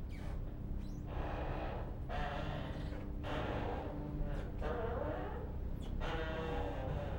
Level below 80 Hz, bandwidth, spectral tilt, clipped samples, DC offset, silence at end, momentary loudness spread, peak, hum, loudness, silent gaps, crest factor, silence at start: -44 dBFS; 16.5 kHz; -7.5 dB/octave; under 0.1%; under 0.1%; 0 s; 5 LU; -26 dBFS; none; -42 LUFS; none; 14 dB; 0 s